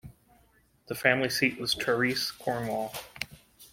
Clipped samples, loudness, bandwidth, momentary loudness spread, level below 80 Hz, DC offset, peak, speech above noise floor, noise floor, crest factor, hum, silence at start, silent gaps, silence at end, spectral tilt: under 0.1%; -29 LUFS; 16.5 kHz; 14 LU; -62 dBFS; under 0.1%; -6 dBFS; 36 dB; -65 dBFS; 26 dB; none; 0.05 s; none; 0.05 s; -3.5 dB/octave